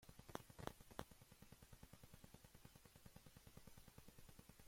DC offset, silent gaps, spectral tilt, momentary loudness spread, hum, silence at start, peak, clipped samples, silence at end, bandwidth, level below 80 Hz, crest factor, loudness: under 0.1%; none; -4.5 dB/octave; 9 LU; none; 0 s; -28 dBFS; under 0.1%; 0 s; 16.5 kHz; -72 dBFS; 34 dB; -62 LUFS